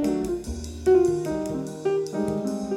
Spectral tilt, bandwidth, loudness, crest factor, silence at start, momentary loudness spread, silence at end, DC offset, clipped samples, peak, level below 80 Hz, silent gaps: -6.5 dB/octave; 14 kHz; -25 LUFS; 14 dB; 0 s; 10 LU; 0 s; under 0.1%; under 0.1%; -10 dBFS; -42 dBFS; none